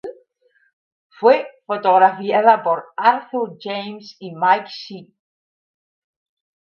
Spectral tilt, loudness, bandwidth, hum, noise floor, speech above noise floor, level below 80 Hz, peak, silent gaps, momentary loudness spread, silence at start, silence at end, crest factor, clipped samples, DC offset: -6 dB/octave; -17 LUFS; 6.8 kHz; none; -62 dBFS; 44 dB; -76 dBFS; 0 dBFS; 0.73-1.10 s; 20 LU; 0.05 s; 1.75 s; 20 dB; under 0.1%; under 0.1%